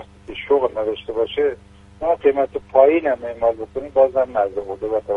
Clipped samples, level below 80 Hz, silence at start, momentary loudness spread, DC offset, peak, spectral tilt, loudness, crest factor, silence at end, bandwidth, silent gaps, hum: under 0.1%; -48 dBFS; 0 s; 11 LU; under 0.1%; -2 dBFS; -7 dB/octave; -19 LUFS; 18 dB; 0 s; 4.3 kHz; none; 50 Hz at -55 dBFS